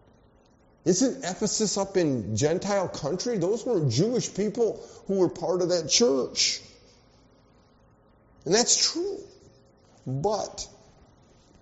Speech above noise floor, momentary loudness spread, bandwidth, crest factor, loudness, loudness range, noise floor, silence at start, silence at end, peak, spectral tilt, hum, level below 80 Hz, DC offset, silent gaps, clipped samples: 34 dB; 13 LU; 8 kHz; 20 dB; -25 LUFS; 3 LU; -59 dBFS; 0.85 s; 0.95 s; -6 dBFS; -4.5 dB/octave; none; -60 dBFS; under 0.1%; none; under 0.1%